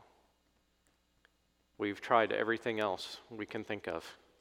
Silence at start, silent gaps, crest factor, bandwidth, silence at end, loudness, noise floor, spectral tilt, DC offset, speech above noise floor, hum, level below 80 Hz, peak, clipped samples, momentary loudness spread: 1.8 s; none; 24 dB; 16 kHz; 0.25 s; -35 LUFS; -75 dBFS; -4.5 dB/octave; under 0.1%; 40 dB; none; -76 dBFS; -12 dBFS; under 0.1%; 14 LU